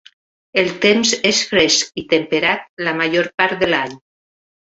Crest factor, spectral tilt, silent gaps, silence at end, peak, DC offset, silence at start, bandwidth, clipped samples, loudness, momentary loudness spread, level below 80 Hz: 18 dB; -2.5 dB/octave; 2.69-2.77 s, 3.34-3.38 s; 0.75 s; 0 dBFS; under 0.1%; 0.55 s; 8.2 kHz; under 0.1%; -16 LUFS; 7 LU; -54 dBFS